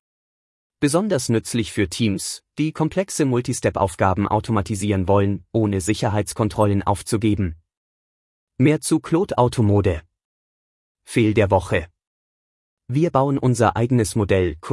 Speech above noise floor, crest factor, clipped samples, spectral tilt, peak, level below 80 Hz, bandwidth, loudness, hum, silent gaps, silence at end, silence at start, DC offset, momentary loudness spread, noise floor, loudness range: over 71 dB; 18 dB; under 0.1%; -6 dB/octave; -4 dBFS; -46 dBFS; 12 kHz; -20 LUFS; none; 7.77-8.47 s, 10.25-10.95 s, 12.07-12.77 s; 0 s; 0.8 s; under 0.1%; 6 LU; under -90 dBFS; 2 LU